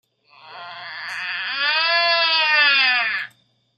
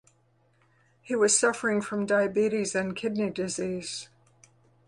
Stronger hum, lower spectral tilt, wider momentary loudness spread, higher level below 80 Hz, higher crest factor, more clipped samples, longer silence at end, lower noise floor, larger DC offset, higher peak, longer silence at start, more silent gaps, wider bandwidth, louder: neither; second, -0.5 dB/octave vs -3.5 dB/octave; first, 20 LU vs 11 LU; second, -80 dBFS vs -68 dBFS; about the same, 20 dB vs 22 dB; neither; second, 0.5 s vs 0.8 s; second, -57 dBFS vs -66 dBFS; neither; first, -2 dBFS vs -8 dBFS; second, 0.45 s vs 1.05 s; neither; first, 13.5 kHz vs 11.5 kHz; first, -17 LUFS vs -27 LUFS